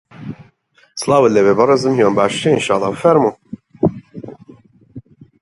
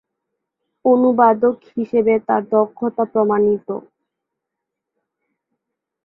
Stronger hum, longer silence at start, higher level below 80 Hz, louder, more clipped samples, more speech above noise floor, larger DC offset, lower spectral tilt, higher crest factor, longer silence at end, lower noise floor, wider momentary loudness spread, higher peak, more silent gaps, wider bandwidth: neither; second, 0.2 s vs 0.85 s; first, -54 dBFS vs -64 dBFS; first, -14 LUFS vs -17 LUFS; neither; second, 41 dB vs 65 dB; neither; second, -5.5 dB/octave vs -11 dB/octave; about the same, 16 dB vs 18 dB; second, 0.4 s vs 2.25 s; second, -54 dBFS vs -81 dBFS; first, 22 LU vs 10 LU; about the same, 0 dBFS vs -2 dBFS; neither; first, 11.5 kHz vs 4 kHz